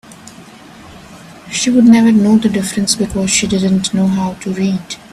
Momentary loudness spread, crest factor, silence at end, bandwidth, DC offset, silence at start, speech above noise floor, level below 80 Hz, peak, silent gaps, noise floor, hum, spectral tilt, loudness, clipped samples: 10 LU; 14 dB; 0.15 s; 13.5 kHz; under 0.1%; 0.1 s; 25 dB; -44 dBFS; 0 dBFS; none; -37 dBFS; none; -4.5 dB/octave; -13 LUFS; under 0.1%